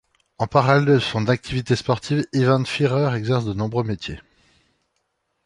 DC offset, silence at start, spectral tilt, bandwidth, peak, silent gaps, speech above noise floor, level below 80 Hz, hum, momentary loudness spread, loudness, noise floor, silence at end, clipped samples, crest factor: under 0.1%; 0.4 s; -6.5 dB/octave; 11 kHz; -2 dBFS; none; 53 dB; -48 dBFS; none; 11 LU; -21 LUFS; -73 dBFS; 1.25 s; under 0.1%; 20 dB